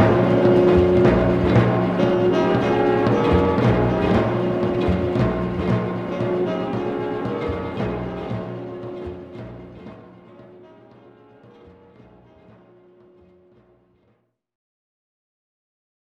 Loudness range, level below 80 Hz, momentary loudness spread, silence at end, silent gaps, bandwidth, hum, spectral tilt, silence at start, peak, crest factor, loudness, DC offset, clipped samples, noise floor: 19 LU; -38 dBFS; 17 LU; 6 s; none; 7.2 kHz; none; -8.5 dB/octave; 0 s; -2 dBFS; 20 dB; -20 LUFS; under 0.1%; under 0.1%; -66 dBFS